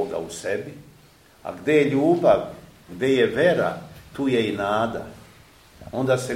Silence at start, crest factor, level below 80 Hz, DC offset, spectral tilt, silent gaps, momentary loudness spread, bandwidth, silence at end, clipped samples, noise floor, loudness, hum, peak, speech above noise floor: 0 s; 18 dB; -56 dBFS; under 0.1%; -6 dB/octave; none; 18 LU; 16 kHz; 0 s; under 0.1%; -53 dBFS; -22 LUFS; none; -6 dBFS; 31 dB